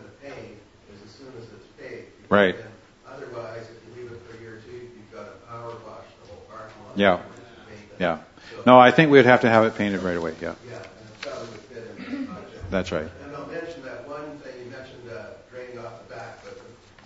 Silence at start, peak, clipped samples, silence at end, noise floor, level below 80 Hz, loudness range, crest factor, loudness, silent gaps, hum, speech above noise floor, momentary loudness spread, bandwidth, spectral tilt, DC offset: 0.25 s; 0 dBFS; under 0.1%; 0.5 s; -48 dBFS; -56 dBFS; 22 LU; 24 dB; -20 LUFS; none; none; 30 dB; 27 LU; 8 kHz; -6.5 dB/octave; under 0.1%